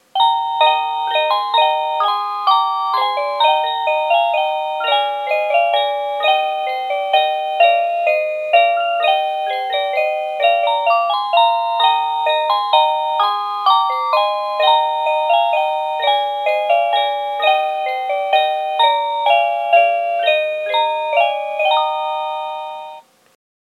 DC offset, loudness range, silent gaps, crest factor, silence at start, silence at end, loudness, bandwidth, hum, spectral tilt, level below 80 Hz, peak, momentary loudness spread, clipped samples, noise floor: under 0.1%; 1 LU; none; 16 dB; 0.15 s; 0.75 s; -16 LUFS; 14 kHz; none; 0.5 dB/octave; -90 dBFS; 0 dBFS; 6 LU; under 0.1%; -38 dBFS